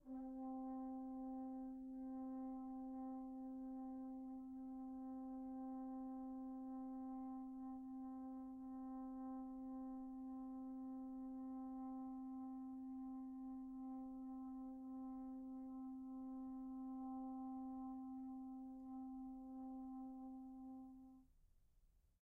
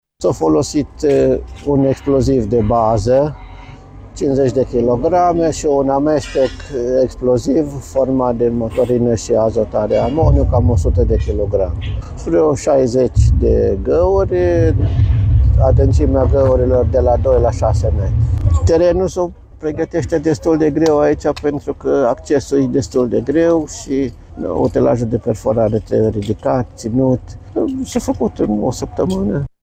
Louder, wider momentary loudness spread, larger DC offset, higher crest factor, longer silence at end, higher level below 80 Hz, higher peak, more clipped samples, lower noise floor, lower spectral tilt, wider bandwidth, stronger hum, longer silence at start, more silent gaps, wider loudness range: second, -52 LUFS vs -15 LUFS; second, 3 LU vs 7 LU; neither; second, 8 dB vs 14 dB; about the same, 0.25 s vs 0.15 s; second, -74 dBFS vs -24 dBFS; second, -42 dBFS vs 0 dBFS; neither; first, -75 dBFS vs -35 dBFS; second, -6 dB/octave vs -7.5 dB/octave; second, 1.9 kHz vs 9.4 kHz; neither; second, 0 s vs 0.2 s; neither; about the same, 2 LU vs 3 LU